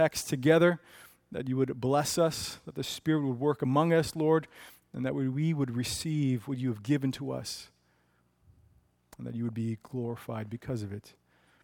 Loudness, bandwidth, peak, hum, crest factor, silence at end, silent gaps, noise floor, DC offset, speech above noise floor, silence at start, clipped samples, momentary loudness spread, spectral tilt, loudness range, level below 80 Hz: -30 LUFS; 18 kHz; -10 dBFS; 60 Hz at -60 dBFS; 22 dB; 0.55 s; none; -70 dBFS; under 0.1%; 40 dB; 0 s; under 0.1%; 14 LU; -5.5 dB/octave; 10 LU; -62 dBFS